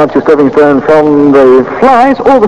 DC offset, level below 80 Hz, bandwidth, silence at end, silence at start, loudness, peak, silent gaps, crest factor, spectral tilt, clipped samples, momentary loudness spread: under 0.1%; -38 dBFS; 9.6 kHz; 0 s; 0 s; -5 LUFS; 0 dBFS; none; 4 dB; -7.5 dB/octave; 20%; 2 LU